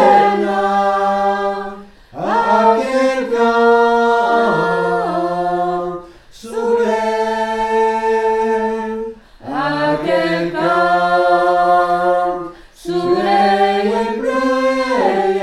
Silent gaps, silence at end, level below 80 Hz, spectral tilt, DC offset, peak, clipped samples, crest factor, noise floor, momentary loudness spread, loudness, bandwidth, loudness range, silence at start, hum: none; 0 s; -48 dBFS; -5.5 dB/octave; under 0.1%; 0 dBFS; under 0.1%; 14 dB; -36 dBFS; 11 LU; -15 LUFS; 12.5 kHz; 3 LU; 0 s; none